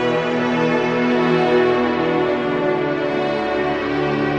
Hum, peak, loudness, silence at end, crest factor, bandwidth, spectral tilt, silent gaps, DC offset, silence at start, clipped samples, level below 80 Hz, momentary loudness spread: none; -6 dBFS; -18 LUFS; 0 s; 12 dB; 7.8 kHz; -6.5 dB/octave; none; under 0.1%; 0 s; under 0.1%; -50 dBFS; 4 LU